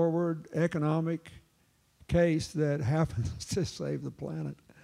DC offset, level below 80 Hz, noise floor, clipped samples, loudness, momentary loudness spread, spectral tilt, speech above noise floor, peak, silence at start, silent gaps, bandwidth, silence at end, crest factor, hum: under 0.1%; -50 dBFS; -69 dBFS; under 0.1%; -31 LUFS; 10 LU; -7 dB/octave; 38 dB; -14 dBFS; 0 s; none; 12.5 kHz; 0.3 s; 16 dB; none